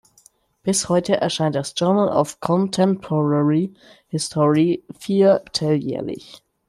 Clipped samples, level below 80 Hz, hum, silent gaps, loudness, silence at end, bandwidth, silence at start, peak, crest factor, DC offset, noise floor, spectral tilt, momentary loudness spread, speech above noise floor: under 0.1%; -58 dBFS; none; none; -20 LUFS; 0.3 s; 13 kHz; 0.65 s; -4 dBFS; 16 dB; under 0.1%; -56 dBFS; -5.5 dB/octave; 10 LU; 36 dB